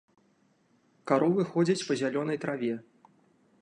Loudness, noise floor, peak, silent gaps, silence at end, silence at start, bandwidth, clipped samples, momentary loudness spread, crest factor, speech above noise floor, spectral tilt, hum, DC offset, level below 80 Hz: -29 LUFS; -68 dBFS; -12 dBFS; none; 0.8 s; 1.05 s; 10.5 kHz; under 0.1%; 9 LU; 20 dB; 40 dB; -6 dB/octave; none; under 0.1%; -76 dBFS